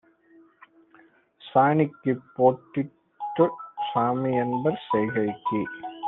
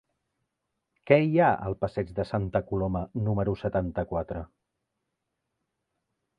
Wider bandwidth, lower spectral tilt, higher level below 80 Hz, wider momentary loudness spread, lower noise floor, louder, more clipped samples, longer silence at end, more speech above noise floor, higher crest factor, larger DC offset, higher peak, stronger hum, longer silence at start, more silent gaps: second, 4.1 kHz vs 5.4 kHz; about the same, -10.5 dB/octave vs -9.5 dB/octave; second, -68 dBFS vs -48 dBFS; about the same, 11 LU vs 10 LU; second, -58 dBFS vs -82 dBFS; about the same, -25 LUFS vs -27 LUFS; neither; second, 0 s vs 1.95 s; second, 34 dB vs 56 dB; about the same, 20 dB vs 24 dB; neither; about the same, -6 dBFS vs -6 dBFS; neither; first, 1.45 s vs 1.05 s; neither